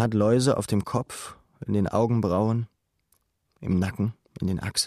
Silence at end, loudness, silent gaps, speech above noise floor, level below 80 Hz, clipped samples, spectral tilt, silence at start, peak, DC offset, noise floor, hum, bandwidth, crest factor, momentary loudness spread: 0 s; -26 LUFS; none; 46 dB; -52 dBFS; under 0.1%; -6 dB/octave; 0 s; -10 dBFS; under 0.1%; -70 dBFS; none; 14.5 kHz; 16 dB; 16 LU